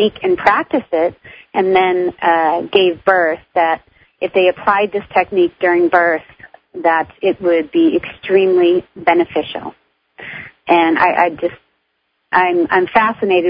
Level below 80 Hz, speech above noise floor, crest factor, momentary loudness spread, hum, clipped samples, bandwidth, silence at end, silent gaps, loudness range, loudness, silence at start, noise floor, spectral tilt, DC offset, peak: -54 dBFS; 53 dB; 16 dB; 11 LU; none; under 0.1%; 5.2 kHz; 0 s; none; 2 LU; -15 LUFS; 0 s; -67 dBFS; -7.5 dB/octave; under 0.1%; 0 dBFS